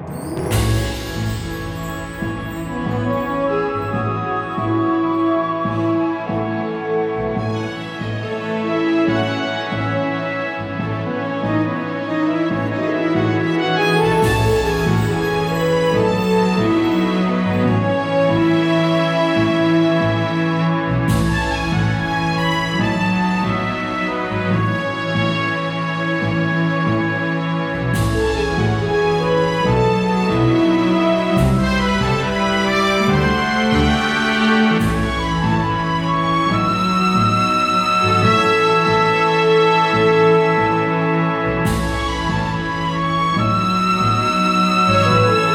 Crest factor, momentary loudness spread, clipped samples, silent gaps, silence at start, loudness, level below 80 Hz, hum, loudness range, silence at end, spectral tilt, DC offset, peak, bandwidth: 16 dB; 8 LU; under 0.1%; none; 0 s; -17 LUFS; -34 dBFS; none; 6 LU; 0 s; -6 dB/octave; under 0.1%; -2 dBFS; 16 kHz